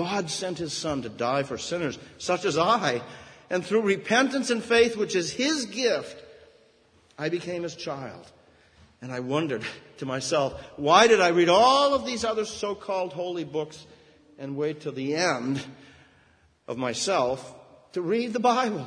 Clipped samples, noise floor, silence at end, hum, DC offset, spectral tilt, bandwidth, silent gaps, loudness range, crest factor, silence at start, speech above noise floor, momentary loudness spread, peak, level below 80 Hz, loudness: under 0.1%; -61 dBFS; 0 s; none; under 0.1%; -4 dB/octave; 10.5 kHz; none; 11 LU; 22 dB; 0 s; 36 dB; 17 LU; -4 dBFS; -62 dBFS; -25 LUFS